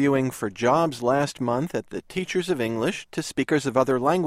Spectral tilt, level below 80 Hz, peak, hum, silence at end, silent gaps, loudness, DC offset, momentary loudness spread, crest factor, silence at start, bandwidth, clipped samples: -5.5 dB/octave; -58 dBFS; -6 dBFS; none; 0 s; none; -25 LUFS; under 0.1%; 8 LU; 18 dB; 0 s; 15.5 kHz; under 0.1%